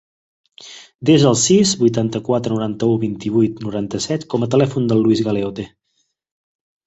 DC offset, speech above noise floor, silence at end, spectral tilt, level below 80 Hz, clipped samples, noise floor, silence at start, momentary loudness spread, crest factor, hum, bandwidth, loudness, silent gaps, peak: under 0.1%; 52 dB; 1.2 s; -5.5 dB/octave; -52 dBFS; under 0.1%; -68 dBFS; 0.6 s; 13 LU; 16 dB; none; 8.2 kHz; -17 LUFS; 0.95-0.99 s; -2 dBFS